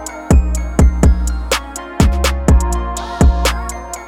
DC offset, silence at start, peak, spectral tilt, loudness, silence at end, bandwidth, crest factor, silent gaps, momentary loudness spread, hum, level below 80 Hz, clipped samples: under 0.1%; 0 s; 0 dBFS; -5.5 dB/octave; -15 LUFS; 0 s; 16 kHz; 14 dB; none; 9 LU; none; -16 dBFS; under 0.1%